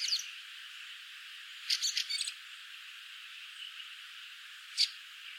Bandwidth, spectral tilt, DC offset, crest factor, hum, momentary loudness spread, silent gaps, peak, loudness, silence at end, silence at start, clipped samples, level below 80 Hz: 16.5 kHz; 11.5 dB/octave; under 0.1%; 24 dB; none; 15 LU; none; -16 dBFS; -37 LUFS; 0 s; 0 s; under 0.1%; under -90 dBFS